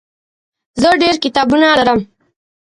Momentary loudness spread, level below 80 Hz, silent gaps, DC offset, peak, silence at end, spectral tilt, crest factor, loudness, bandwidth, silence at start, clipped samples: 7 LU; -46 dBFS; none; under 0.1%; 0 dBFS; 0.65 s; -4 dB/octave; 14 dB; -12 LUFS; 11.5 kHz; 0.75 s; under 0.1%